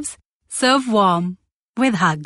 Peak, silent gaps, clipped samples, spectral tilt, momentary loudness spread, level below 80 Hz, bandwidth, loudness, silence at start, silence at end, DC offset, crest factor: -2 dBFS; 0.25-0.40 s, 1.54-1.74 s; under 0.1%; -4.5 dB/octave; 14 LU; -62 dBFS; 11.5 kHz; -18 LUFS; 0 s; 0 s; under 0.1%; 16 dB